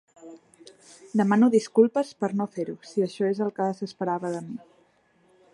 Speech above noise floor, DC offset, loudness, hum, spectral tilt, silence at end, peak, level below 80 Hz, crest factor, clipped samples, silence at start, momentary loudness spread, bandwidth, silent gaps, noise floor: 39 dB; under 0.1%; -25 LUFS; none; -7 dB/octave; 0.95 s; -6 dBFS; -78 dBFS; 20 dB; under 0.1%; 0.25 s; 13 LU; 11.5 kHz; none; -63 dBFS